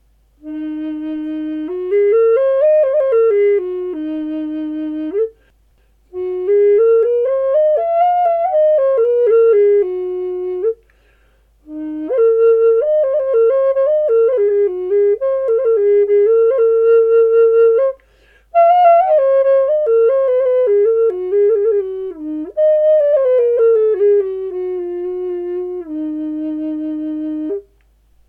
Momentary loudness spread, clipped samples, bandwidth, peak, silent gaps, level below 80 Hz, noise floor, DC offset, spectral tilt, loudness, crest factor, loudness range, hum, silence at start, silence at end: 12 LU; under 0.1%; 3.4 kHz; -2 dBFS; none; -54 dBFS; -54 dBFS; under 0.1%; -7.5 dB/octave; -14 LUFS; 12 dB; 6 LU; none; 0.45 s; 0.65 s